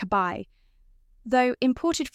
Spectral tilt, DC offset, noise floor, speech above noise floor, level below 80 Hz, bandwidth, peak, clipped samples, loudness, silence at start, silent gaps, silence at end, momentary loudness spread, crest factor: -4.5 dB/octave; under 0.1%; -58 dBFS; 33 dB; -54 dBFS; 14.5 kHz; -10 dBFS; under 0.1%; -25 LUFS; 0 s; none; 0.05 s; 20 LU; 18 dB